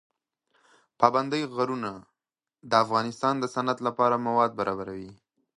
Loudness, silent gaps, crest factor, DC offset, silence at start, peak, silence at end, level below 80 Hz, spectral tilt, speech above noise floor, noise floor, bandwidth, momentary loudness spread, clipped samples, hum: -26 LUFS; none; 24 dB; under 0.1%; 1 s; -4 dBFS; 0.45 s; -68 dBFS; -5.5 dB/octave; 64 dB; -90 dBFS; 11.5 kHz; 13 LU; under 0.1%; none